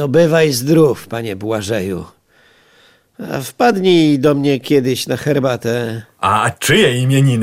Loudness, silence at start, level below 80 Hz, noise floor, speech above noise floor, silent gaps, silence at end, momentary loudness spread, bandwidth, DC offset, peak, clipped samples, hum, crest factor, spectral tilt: -15 LUFS; 0 s; -50 dBFS; -51 dBFS; 37 dB; none; 0 s; 12 LU; 16.5 kHz; under 0.1%; -2 dBFS; under 0.1%; none; 12 dB; -5.5 dB/octave